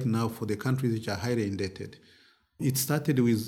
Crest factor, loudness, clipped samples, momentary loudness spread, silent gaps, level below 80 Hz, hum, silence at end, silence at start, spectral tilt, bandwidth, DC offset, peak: 16 dB; -29 LUFS; under 0.1%; 9 LU; none; -66 dBFS; none; 0 s; 0 s; -5.5 dB/octave; 18 kHz; under 0.1%; -12 dBFS